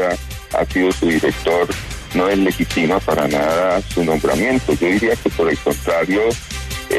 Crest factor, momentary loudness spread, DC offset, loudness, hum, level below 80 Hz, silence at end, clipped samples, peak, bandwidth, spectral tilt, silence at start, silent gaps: 14 dB; 6 LU; under 0.1%; -17 LUFS; none; -34 dBFS; 0 s; under 0.1%; -4 dBFS; 14 kHz; -5 dB/octave; 0 s; none